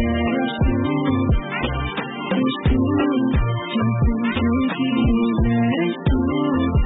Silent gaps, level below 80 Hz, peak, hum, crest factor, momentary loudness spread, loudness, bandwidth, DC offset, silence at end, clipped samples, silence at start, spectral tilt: none; -28 dBFS; -8 dBFS; none; 10 dB; 4 LU; -20 LUFS; 4 kHz; under 0.1%; 0 s; under 0.1%; 0 s; -12 dB/octave